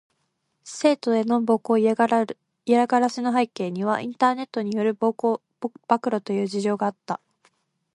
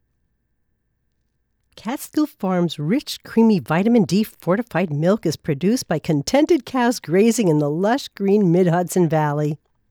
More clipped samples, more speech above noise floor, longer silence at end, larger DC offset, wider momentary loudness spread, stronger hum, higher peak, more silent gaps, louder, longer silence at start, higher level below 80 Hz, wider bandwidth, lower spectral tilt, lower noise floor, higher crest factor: neither; about the same, 51 dB vs 51 dB; first, 0.8 s vs 0.35 s; neither; first, 12 LU vs 7 LU; neither; about the same, -4 dBFS vs -6 dBFS; neither; second, -23 LUFS vs -19 LUFS; second, 0.65 s vs 1.75 s; second, -74 dBFS vs -58 dBFS; second, 11.5 kHz vs 19 kHz; about the same, -5.5 dB/octave vs -6 dB/octave; first, -74 dBFS vs -69 dBFS; first, 20 dB vs 14 dB